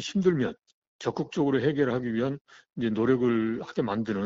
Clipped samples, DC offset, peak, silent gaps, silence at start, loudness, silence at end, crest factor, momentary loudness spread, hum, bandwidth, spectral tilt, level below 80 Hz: under 0.1%; under 0.1%; -12 dBFS; 0.74-0.99 s, 2.41-2.45 s; 0 s; -28 LUFS; 0 s; 16 dB; 9 LU; none; 7.8 kHz; -6 dB/octave; -62 dBFS